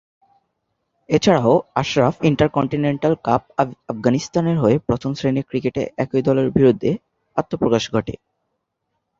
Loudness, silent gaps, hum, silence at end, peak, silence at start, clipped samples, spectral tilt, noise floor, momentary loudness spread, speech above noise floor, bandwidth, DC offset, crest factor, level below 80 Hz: -19 LUFS; none; none; 1.05 s; -2 dBFS; 1.1 s; under 0.1%; -6.5 dB/octave; -75 dBFS; 8 LU; 57 dB; 7.8 kHz; under 0.1%; 18 dB; -48 dBFS